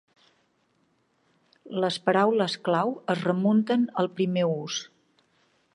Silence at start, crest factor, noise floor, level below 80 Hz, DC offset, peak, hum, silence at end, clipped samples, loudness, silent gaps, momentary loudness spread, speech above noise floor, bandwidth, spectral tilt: 1.65 s; 20 dB; -69 dBFS; -78 dBFS; under 0.1%; -8 dBFS; none; 0.9 s; under 0.1%; -26 LUFS; none; 10 LU; 44 dB; 11 kHz; -5.5 dB/octave